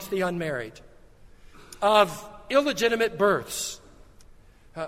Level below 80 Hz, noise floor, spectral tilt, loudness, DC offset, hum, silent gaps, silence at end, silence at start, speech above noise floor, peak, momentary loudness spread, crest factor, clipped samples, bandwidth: -54 dBFS; -51 dBFS; -3.5 dB/octave; -25 LUFS; under 0.1%; none; none; 0 s; 0 s; 27 dB; -4 dBFS; 20 LU; 22 dB; under 0.1%; 16 kHz